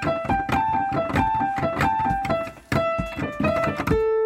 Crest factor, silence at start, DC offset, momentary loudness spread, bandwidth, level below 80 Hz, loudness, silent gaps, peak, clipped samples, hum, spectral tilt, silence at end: 16 dB; 0 s; under 0.1%; 4 LU; 16 kHz; -40 dBFS; -23 LUFS; none; -8 dBFS; under 0.1%; none; -6.5 dB/octave; 0 s